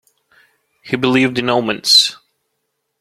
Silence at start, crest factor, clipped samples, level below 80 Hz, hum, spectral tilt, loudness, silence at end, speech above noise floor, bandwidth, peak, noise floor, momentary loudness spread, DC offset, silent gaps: 0.85 s; 18 dB; under 0.1%; -58 dBFS; none; -3 dB/octave; -13 LUFS; 0.85 s; 58 dB; 15.5 kHz; 0 dBFS; -72 dBFS; 9 LU; under 0.1%; none